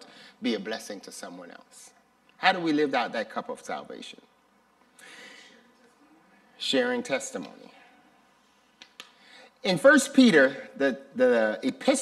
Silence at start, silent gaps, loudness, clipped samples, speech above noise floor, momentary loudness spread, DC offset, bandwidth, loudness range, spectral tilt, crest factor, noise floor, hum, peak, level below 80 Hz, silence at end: 0.4 s; none; -25 LUFS; under 0.1%; 38 dB; 26 LU; under 0.1%; 13.5 kHz; 12 LU; -3.5 dB/octave; 24 dB; -64 dBFS; none; -4 dBFS; -78 dBFS; 0 s